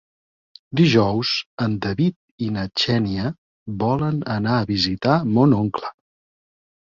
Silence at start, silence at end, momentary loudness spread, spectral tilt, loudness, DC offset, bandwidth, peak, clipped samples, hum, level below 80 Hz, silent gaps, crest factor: 0.7 s; 1.05 s; 12 LU; -7 dB/octave; -21 LUFS; under 0.1%; 7.6 kHz; -4 dBFS; under 0.1%; none; -48 dBFS; 1.46-1.57 s, 2.16-2.38 s, 3.38-3.66 s; 18 dB